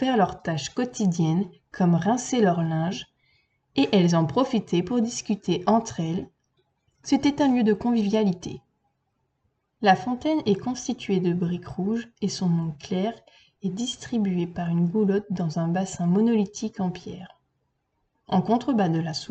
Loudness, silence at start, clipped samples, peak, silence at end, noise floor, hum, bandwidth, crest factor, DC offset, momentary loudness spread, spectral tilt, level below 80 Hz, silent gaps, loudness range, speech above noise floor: -25 LUFS; 0 s; under 0.1%; -6 dBFS; 0.05 s; -74 dBFS; none; 8.6 kHz; 18 dB; under 0.1%; 9 LU; -6 dB/octave; -60 dBFS; none; 3 LU; 51 dB